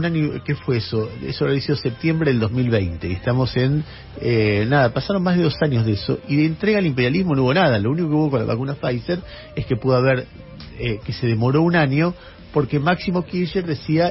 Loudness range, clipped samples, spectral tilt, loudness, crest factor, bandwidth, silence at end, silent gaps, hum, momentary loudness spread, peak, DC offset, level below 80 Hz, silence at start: 3 LU; under 0.1%; -6 dB/octave; -20 LUFS; 16 dB; 5.8 kHz; 0 s; none; none; 8 LU; -4 dBFS; under 0.1%; -44 dBFS; 0 s